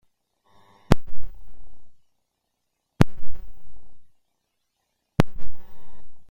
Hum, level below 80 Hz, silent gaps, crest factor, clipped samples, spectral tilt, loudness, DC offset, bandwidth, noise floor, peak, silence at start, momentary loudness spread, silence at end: none; -38 dBFS; none; 18 dB; under 0.1%; -7 dB/octave; -26 LUFS; under 0.1%; 16.5 kHz; -78 dBFS; -2 dBFS; 0.9 s; 24 LU; 0.05 s